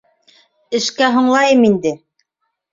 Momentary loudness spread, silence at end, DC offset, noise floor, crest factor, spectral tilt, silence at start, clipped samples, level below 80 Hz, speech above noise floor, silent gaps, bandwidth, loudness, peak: 11 LU; 0.75 s; under 0.1%; -73 dBFS; 16 dB; -4 dB/octave; 0.7 s; under 0.1%; -60 dBFS; 60 dB; none; 7.6 kHz; -14 LUFS; -2 dBFS